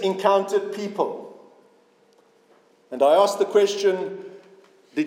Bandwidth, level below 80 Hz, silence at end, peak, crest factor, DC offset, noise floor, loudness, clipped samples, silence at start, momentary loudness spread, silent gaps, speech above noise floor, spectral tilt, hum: 16 kHz; under -90 dBFS; 0 s; -4 dBFS; 20 dB; under 0.1%; -58 dBFS; -21 LUFS; under 0.1%; 0 s; 20 LU; none; 38 dB; -4.5 dB/octave; none